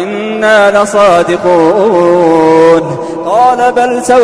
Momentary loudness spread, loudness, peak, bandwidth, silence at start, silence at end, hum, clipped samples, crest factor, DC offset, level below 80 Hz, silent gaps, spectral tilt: 6 LU; -8 LUFS; 0 dBFS; 11 kHz; 0 s; 0 s; none; 0.7%; 8 dB; under 0.1%; -44 dBFS; none; -5 dB/octave